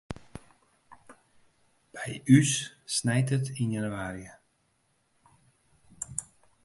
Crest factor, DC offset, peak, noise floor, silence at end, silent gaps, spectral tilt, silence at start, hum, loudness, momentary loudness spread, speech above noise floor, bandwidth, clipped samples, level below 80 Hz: 24 dB; under 0.1%; -6 dBFS; -72 dBFS; 0.4 s; none; -5 dB/octave; 0.1 s; none; -28 LUFS; 24 LU; 45 dB; 11.5 kHz; under 0.1%; -60 dBFS